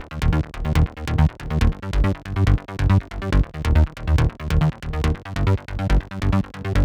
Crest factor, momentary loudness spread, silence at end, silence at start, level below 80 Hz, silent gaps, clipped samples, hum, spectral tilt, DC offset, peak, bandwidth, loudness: 16 dB; 4 LU; 0 s; 0 s; -24 dBFS; none; under 0.1%; none; -7.5 dB/octave; under 0.1%; -4 dBFS; 11.5 kHz; -22 LUFS